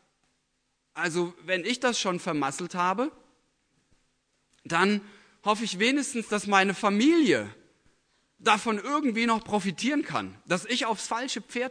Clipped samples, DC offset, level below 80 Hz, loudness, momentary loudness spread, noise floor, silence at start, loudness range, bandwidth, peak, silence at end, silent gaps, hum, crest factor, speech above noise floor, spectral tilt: under 0.1%; under 0.1%; -70 dBFS; -27 LUFS; 9 LU; -75 dBFS; 0.95 s; 5 LU; 11 kHz; -6 dBFS; 0 s; none; none; 22 dB; 49 dB; -4 dB/octave